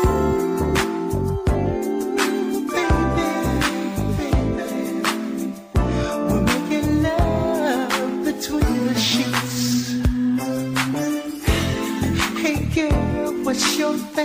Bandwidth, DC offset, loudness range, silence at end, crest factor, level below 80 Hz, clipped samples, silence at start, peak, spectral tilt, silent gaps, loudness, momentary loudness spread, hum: 16 kHz; under 0.1%; 2 LU; 0 s; 16 dB; -30 dBFS; under 0.1%; 0 s; -6 dBFS; -5 dB/octave; none; -21 LUFS; 5 LU; none